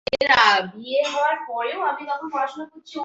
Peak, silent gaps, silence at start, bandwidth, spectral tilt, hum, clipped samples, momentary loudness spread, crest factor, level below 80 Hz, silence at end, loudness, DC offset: -4 dBFS; none; 0.1 s; 8 kHz; -2.5 dB/octave; none; under 0.1%; 13 LU; 20 dB; -60 dBFS; 0 s; -21 LUFS; under 0.1%